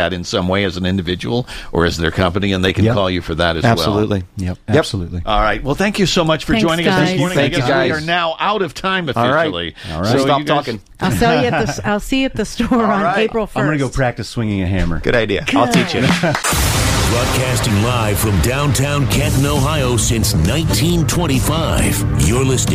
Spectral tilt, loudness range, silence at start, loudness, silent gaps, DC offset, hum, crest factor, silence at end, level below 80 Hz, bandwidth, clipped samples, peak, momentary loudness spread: -5 dB/octave; 2 LU; 0 s; -16 LUFS; none; under 0.1%; none; 16 dB; 0 s; -28 dBFS; 15.5 kHz; under 0.1%; 0 dBFS; 5 LU